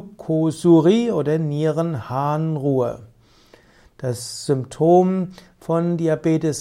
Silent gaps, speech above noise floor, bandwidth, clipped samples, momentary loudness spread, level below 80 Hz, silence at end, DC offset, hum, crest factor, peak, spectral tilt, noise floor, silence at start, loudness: none; 33 dB; 13.5 kHz; under 0.1%; 12 LU; -58 dBFS; 0 s; under 0.1%; none; 16 dB; -4 dBFS; -7 dB/octave; -52 dBFS; 0 s; -20 LUFS